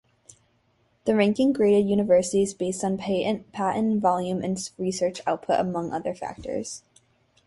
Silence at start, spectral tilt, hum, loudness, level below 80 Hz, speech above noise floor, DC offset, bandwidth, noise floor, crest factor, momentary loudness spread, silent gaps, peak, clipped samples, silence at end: 1.05 s; -5.5 dB/octave; none; -25 LUFS; -60 dBFS; 42 dB; under 0.1%; 11.5 kHz; -66 dBFS; 18 dB; 11 LU; none; -8 dBFS; under 0.1%; 0.7 s